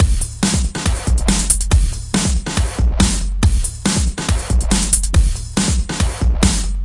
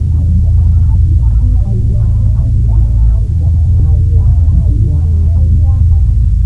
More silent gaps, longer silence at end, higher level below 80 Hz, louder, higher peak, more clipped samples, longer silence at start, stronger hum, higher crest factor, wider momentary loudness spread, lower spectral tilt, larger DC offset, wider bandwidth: neither; about the same, 0 s vs 0 s; second, -18 dBFS vs -10 dBFS; second, -17 LUFS vs -11 LUFS; about the same, 0 dBFS vs 0 dBFS; neither; about the same, 0 s vs 0 s; neither; first, 16 dB vs 8 dB; first, 5 LU vs 2 LU; second, -4 dB/octave vs -10.5 dB/octave; second, under 0.1% vs 0.8%; first, 11.5 kHz vs 1.4 kHz